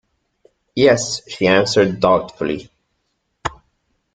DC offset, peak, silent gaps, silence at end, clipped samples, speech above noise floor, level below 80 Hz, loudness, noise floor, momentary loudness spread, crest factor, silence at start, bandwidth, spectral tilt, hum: under 0.1%; -2 dBFS; none; 0.6 s; under 0.1%; 54 dB; -50 dBFS; -17 LUFS; -70 dBFS; 15 LU; 18 dB; 0.75 s; 9.4 kHz; -4.5 dB/octave; none